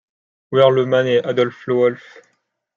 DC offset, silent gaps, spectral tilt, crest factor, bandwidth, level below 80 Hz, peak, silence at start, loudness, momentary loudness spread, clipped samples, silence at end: under 0.1%; none; -7 dB/octave; 16 dB; 7.2 kHz; -66 dBFS; -2 dBFS; 0.5 s; -17 LUFS; 7 LU; under 0.1%; 0.8 s